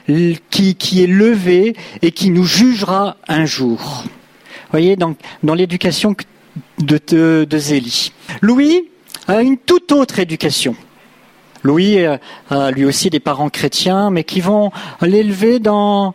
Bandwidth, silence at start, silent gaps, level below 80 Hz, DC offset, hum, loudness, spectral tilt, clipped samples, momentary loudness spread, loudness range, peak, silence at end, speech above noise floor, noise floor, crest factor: 16 kHz; 0.1 s; none; -52 dBFS; under 0.1%; none; -14 LUFS; -5 dB/octave; under 0.1%; 9 LU; 3 LU; 0 dBFS; 0 s; 33 dB; -46 dBFS; 12 dB